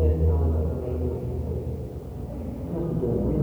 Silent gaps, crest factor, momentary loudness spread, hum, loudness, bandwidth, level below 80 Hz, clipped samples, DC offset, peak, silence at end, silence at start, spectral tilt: none; 14 dB; 12 LU; none; -28 LUFS; 3.1 kHz; -30 dBFS; under 0.1%; under 0.1%; -12 dBFS; 0 s; 0 s; -11 dB/octave